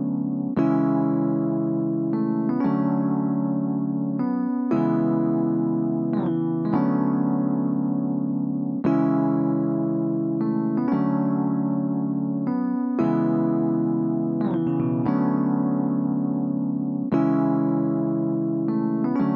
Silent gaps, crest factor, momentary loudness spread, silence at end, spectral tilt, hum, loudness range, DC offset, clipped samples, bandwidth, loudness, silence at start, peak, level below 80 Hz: none; 14 dB; 4 LU; 0 s; -12 dB/octave; none; 1 LU; under 0.1%; under 0.1%; 4.3 kHz; -23 LUFS; 0 s; -10 dBFS; -66 dBFS